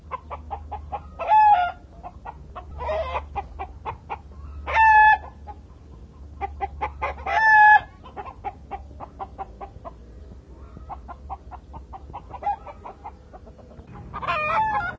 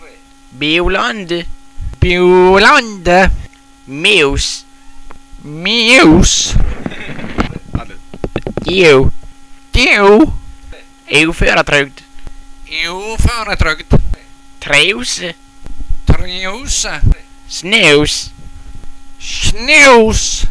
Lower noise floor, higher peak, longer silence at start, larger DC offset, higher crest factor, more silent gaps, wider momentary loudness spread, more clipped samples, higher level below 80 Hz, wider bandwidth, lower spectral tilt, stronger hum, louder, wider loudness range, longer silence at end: first, -44 dBFS vs -39 dBFS; second, -4 dBFS vs 0 dBFS; about the same, 0.05 s vs 0 s; neither; first, 20 dB vs 12 dB; neither; first, 26 LU vs 19 LU; neither; second, -42 dBFS vs -20 dBFS; second, 7.2 kHz vs 11 kHz; first, -5 dB/octave vs -3.5 dB/octave; neither; second, -20 LUFS vs -10 LUFS; first, 18 LU vs 5 LU; about the same, 0 s vs 0 s